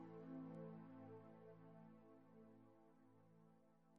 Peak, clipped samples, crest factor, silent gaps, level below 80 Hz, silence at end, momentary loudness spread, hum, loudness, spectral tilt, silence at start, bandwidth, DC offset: -46 dBFS; under 0.1%; 16 dB; none; under -90 dBFS; 0 s; 12 LU; none; -60 LUFS; -9 dB/octave; 0 s; 4.9 kHz; under 0.1%